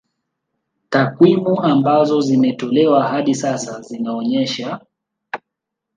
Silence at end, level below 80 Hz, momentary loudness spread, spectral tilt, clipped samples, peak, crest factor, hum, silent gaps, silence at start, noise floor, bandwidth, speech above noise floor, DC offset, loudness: 0.6 s; -66 dBFS; 17 LU; -6 dB/octave; under 0.1%; 0 dBFS; 16 dB; none; none; 0.9 s; -80 dBFS; 9.6 kHz; 65 dB; under 0.1%; -16 LUFS